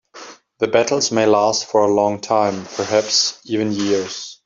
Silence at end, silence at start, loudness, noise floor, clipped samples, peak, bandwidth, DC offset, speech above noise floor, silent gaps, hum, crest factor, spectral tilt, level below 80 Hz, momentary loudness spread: 0.1 s; 0.15 s; -18 LUFS; -40 dBFS; under 0.1%; -2 dBFS; 7.8 kHz; under 0.1%; 23 dB; none; none; 16 dB; -3 dB/octave; -62 dBFS; 9 LU